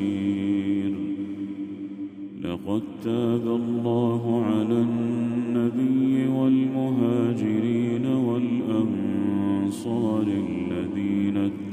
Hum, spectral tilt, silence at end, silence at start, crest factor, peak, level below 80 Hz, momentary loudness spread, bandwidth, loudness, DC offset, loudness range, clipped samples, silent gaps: none; -8.5 dB/octave; 0 s; 0 s; 14 dB; -10 dBFS; -64 dBFS; 9 LU; 10.5 kHz; -25 LUFS; under 0.1%; 5 LU; under 0.1%; none